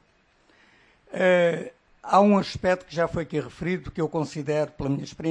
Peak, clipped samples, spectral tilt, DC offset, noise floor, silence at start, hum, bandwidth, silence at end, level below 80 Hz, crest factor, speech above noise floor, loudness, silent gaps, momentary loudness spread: -6 dBFS; under 0.1%; -6.5 dB/octave; under 0.1%; -63 dBFS; 1.1 s; none; 10 kHz; 0 s; -52 dBFS; 20 dB; 39 dB; -25 LUFS; none; 11 LU